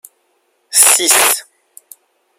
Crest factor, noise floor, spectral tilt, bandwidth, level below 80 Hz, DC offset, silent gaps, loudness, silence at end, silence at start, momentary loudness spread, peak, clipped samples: 16 dB; -62 dBFS; 2 dB/octave; over 20 kHz; -68 dBFS; under 0.1%; none; -9 LUFS; 0.95 s; 0.7 s; 8 LU; 0 dBFS; 0.2%